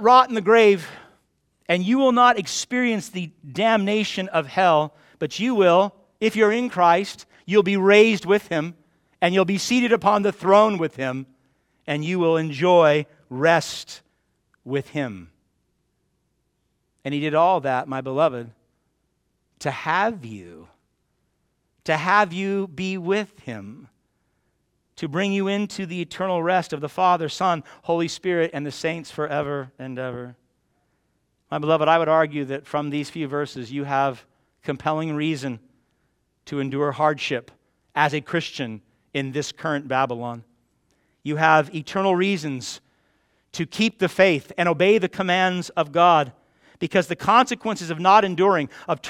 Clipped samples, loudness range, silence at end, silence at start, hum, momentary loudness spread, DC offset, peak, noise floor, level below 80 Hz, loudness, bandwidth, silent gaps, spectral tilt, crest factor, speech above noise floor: under 0.1%; 8 LU; 0 s; 0 s; none; 16 LU; under 0.1%; -2 dBFS; -71 dBFS; -66 dBFS; -21 LUFS; 15 kHz; none; -5 dB/octave; 20 dB; 50 dB